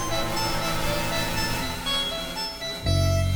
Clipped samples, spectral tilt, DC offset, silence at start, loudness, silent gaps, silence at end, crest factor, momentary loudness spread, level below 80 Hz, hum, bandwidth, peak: under 0.1%; -4 dB/octave; under 0.1%; 0 s; -26 LUFS; none; 0 s; 14 dB; 6 LU; -34 dBFS; none; over 20 kHz; -12 dBFS